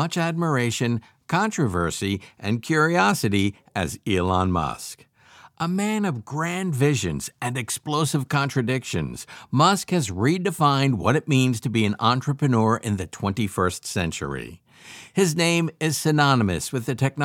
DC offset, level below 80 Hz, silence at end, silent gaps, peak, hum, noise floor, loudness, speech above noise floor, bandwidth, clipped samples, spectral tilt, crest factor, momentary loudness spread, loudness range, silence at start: under 0.1%; -50 dBFS; 0 s; none; -2 dBFS; none; -51 dBFS; -23 LUFS; 29 dB; 17 kHz; under 0.1%; -5 dB/octave; 20 dB; 9 LU; 4 LU; 0 s